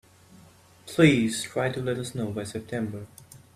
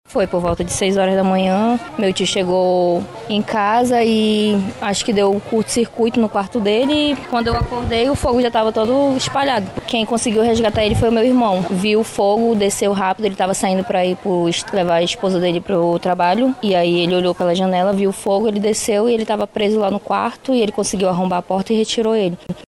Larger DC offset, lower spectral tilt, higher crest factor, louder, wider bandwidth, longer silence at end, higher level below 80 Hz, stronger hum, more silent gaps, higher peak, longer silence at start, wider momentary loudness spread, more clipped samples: neither; about the same, -5.5 dB/octave vs -5 dB/octave; first, 22 dB vs 10 dB; second, -26 LUFS vs -17 LUFS; first, 14.5 kHz vs 12.5 kHz; first, 0.2 s vs 0.05 s; second, -58 dBFS vs -40 dBFS; neither; neither; about the same, -6 dBFS vs -6 dBFS; first, 0.85 s vs 0.1 s; first, 15 LU vs 4 LU; neither